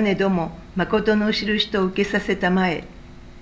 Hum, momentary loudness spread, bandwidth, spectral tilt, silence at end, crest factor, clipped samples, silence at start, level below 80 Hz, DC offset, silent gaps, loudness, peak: none; 6 LU; 7.8 kHz; -6 dB/octave; 0 s; 16 dB; under 0.1%; 0 s; -44 dBFS; under 0.1%; none; -21 LUFS; -6 dBFS